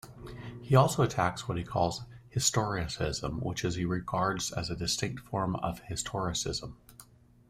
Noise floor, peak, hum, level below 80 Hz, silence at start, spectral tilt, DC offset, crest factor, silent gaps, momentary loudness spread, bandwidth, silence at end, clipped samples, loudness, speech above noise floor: -57 dBFS; -10 dBFS; none; -52 dBFS; 0.05 s; -4.5 dB/octave; under 0.1%; 22 dB; none; 11 LU; 16 kHz; 0.45 s; under 0.1%; -31 LUFS; 26 dB